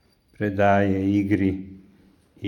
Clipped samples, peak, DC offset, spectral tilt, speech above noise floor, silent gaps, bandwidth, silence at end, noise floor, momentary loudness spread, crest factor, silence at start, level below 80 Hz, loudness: under 0.1%; -6 dBFS; under 0.1%; -8.5 dB/octave; 35 dB; none; 9.2 kHz; 0 s; -56 dBFS; 13 LU; 18 dB; 0.4 s; -58 dBFS; -22 LUFS